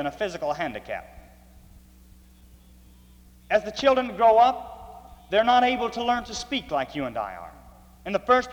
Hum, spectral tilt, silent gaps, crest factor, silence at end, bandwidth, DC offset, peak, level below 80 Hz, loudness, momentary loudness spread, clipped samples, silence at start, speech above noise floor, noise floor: none; -4 dB/octave; none; 20 dB; 0 s; 19.5 kHz; under 0.1%; -6 dBFS; -52 dBFS; -24 LUFS; 19 LU; under 0.1%; 0 s; 28 dB; -52 dBFS